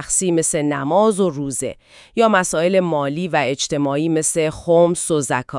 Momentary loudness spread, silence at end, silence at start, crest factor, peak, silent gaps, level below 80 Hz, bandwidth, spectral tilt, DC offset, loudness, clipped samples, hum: 6 LU; 0 s; 0 s; 16 dB; -2 dBFS; none; -50 dBFS; 12 kHz; -4 dB/octave; under 0.1%; -18 LUFS; under 0.1%; none